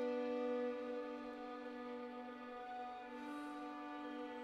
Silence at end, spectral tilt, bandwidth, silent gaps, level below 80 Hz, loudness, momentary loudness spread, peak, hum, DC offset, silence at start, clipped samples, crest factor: 0 s; -5 dB/octave; 11 kHz; none; -80 dBFS; -47 LUFS; 9 LU; -32 dBFS; none; under 0.1%; 0 s; under 0.1%; 14 dB